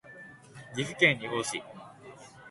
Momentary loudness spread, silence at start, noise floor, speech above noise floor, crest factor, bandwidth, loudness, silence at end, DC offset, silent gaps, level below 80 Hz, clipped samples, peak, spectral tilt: 25 LU; 0.05 s; -50 dBFS; 21 dB; 26 dB; 12 kHz; -28 LUFS; 0 s; under 0.1%; none; -68 dBFS; under 0.1%; -6 dBFS; -3.5 dB/octave